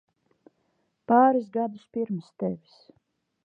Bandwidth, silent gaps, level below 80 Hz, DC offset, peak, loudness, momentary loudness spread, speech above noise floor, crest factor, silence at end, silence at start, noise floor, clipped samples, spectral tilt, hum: 5.2 kHz; none; -74 dBFS; under 0.1%; -8 dBFS; -25 LUFS; 15 LU; 48 dB; 20 dB; 0.9 s; 1.1 s; -73 dBFS; under 0.1%; -9.5 dB/octave; none